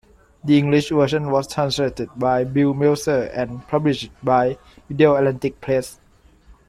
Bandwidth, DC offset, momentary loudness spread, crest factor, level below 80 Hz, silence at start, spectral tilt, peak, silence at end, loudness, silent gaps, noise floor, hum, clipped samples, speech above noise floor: 14 kHz; under 0.1%; 10 LU; 18 dB; -50 dBFS; 0.45 s; -6.5 dB/octave; -2 dBFS; 0.15 s; -20 LUFS; none; -50 dBFS; none; under 0.1%; 31 dB